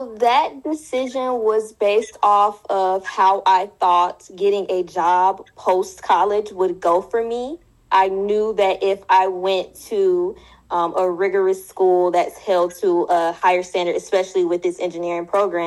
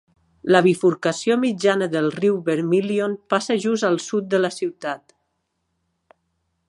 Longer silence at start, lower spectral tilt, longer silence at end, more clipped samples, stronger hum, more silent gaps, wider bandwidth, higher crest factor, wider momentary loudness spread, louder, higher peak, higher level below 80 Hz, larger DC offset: second, 0 s vs 0.45 s; about the same, -4.5 dB/octave vs -5.5 dB/octave; second, 0 s vs 1.7 s; neither; neither; neither; about the same, 12.5 kHz vs 11.5 kHz; second, 14 dB vs 20 dB; second, 7 LU vs 10 LU; about the same, -19 LUFS vs -21 LUFS; second, -4 dBFS vs 0 dBFS; first, -60 dBFS vs -68 dBFS; neither